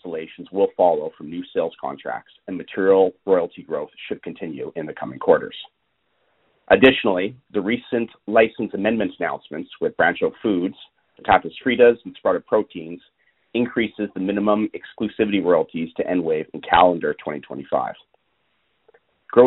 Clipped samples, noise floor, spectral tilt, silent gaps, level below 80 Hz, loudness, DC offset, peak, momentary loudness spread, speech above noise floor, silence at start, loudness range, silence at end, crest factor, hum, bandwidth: under 0.1%; -69 dBFS; -3.5 dB/octave; none; -56 dBFS; -21 LUFS; under 0.1%; 0 dBFS; 16 LU; 48 dB; 0.05 s; 3 LU; 0 s; 20 dB; none; 4.1 kHz